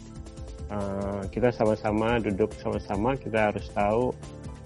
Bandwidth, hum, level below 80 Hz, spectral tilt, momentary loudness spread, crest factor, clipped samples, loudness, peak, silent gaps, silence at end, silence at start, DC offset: 11.5 kHz; none; -42 dBFS; -7 dB/octave; 15 LU; 18 dB; under 0.1%; -27 LUFS; -10 dBFS; none; 0 s; 0 s; under 0.1%